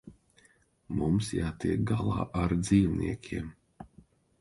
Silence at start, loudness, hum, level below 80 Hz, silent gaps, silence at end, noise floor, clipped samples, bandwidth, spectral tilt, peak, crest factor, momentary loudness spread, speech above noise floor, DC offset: 0.05 s; -30 LUFS; none; -46 dBFS; none; 0.55 s; -65 dBFS; under 0.1%; 11.5 kHz; -7 dB/octave; -12 dBFS; 18 dB; 12 LU; 37 dB; under 0.1%